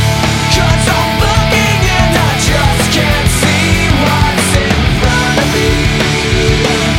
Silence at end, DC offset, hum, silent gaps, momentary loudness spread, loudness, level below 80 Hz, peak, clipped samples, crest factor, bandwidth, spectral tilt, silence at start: 0 s; under 0.1%; none; none; 1 LU; -10 LUFS; -18 dBFS; 0 dBFS; under 0.1%; 10 dB; 17 kHz; -4.5 dB/octave; 0 s